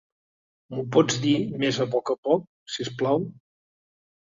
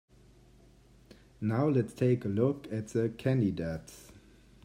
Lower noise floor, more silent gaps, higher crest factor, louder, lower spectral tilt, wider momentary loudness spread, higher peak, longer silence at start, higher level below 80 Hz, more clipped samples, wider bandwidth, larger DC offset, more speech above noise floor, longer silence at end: first, under -90 dBFS vs -59 dBFS; first, 2.18-2.23 s, 2.47-2.66 s vs none; about the same, 20 dB vs 18 dB; first, -25 LUFS vs -31 LUFS; second, -5 dB/octave vs -8 dB/octave; about the same, 12 LU vs 11 LU; first, -6 dBFS vs -16 dBFS; second, 0.7 s vs 1.4 s; second, -66 dBFS vs -60 dBFS; neither; second, 7.8 kHz vs 13 kHz; neither; first, over 66 dB vs 29 dB; first, 0.95 s vs 0.45 s